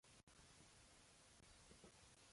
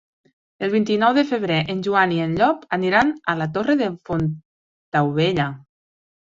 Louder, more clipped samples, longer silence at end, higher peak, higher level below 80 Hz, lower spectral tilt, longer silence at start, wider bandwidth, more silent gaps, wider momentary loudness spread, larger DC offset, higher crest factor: second, -67 LUFS vs -20 LUFS; neither; second, 0 s vs 0.8 s; second, -52 dBFS vs -4 dBFS; second, -78 dBFS vs -54 dBFS; second, -2.5 dB/octave vs -7 dB/octave; second, 0.05 s vs 0.6 s; first, 11.5 kHz vs 7.6 kHz; second, 0.23-0.27 s vs 4.45-4.92 s; second, 2 LU vs 7 LU; neither; about the same, 18 dB vs 18 dB